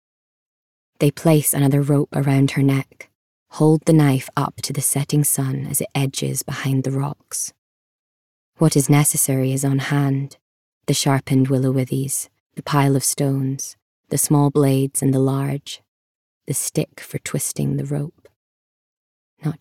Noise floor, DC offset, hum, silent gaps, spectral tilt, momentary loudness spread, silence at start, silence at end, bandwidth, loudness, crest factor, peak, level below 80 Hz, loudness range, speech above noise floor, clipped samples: under -90 dBFS; under 0.1%; none; 3.15-3.46 s, 7.58-8.53 s, 10.42-10.81 s, 12.40-12.50 s, 13.82-14.04 s, 15.88-16.41 s, 18.36-19.37 s; -5.5 dB/octave; 13 LU; 1 s; 0.05 s; 16.5 kHz; -19 LUFS; 18 dB; -4 dBFS; -62 dBFS; 6 LU; over 71 dB; under 0.1%